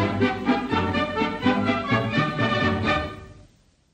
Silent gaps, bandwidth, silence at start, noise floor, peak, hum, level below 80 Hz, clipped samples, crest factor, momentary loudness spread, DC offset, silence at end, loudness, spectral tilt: none; 9.2 kHz; 0 s; -57 dBFS; -8 dBFS; none; -46 dBFS; under 0.1%; 16 dB; 3 LU; under 0.1%; 0.5 s; -23 LUFS; -6.5 dB/octave